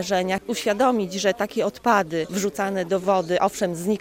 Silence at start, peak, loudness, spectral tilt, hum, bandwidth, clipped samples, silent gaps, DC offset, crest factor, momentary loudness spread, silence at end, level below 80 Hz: 0 s; -6 dBFS; -23 LUFS; -4.5 dB/octave; none; 17 kHz; under 0.1%; none; under 0.1%; 18 dB; 5 LU; 0 s; -58 dBFS